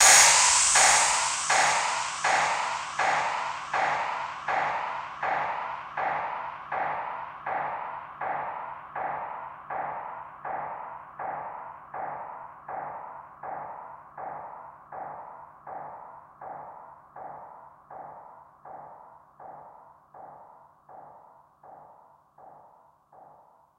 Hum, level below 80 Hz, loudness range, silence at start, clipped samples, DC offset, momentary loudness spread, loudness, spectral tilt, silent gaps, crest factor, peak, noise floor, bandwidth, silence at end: none; -66 dBFS; 23 LU; 0 s; under 0.1%; under 0.1%; 24 LU; -26 LUFS; 1.5 dB/octave; none; 26 dB; -2 dBFS; -58 dBFS; 16 kHz; 0.55 s